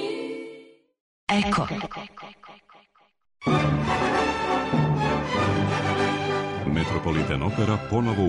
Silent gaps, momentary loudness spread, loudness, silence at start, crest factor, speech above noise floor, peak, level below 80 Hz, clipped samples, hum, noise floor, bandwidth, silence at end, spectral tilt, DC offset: 1.00-1.27 s; 12 LU; -25 LUFS; 0 s; 14 dB; 35 dB; -12 dBFS; -44 dBFS; under 0.1%; none; -60 dBFS; 10.5 kHz; 0 s; -6.5 dB/octave; under 0.1%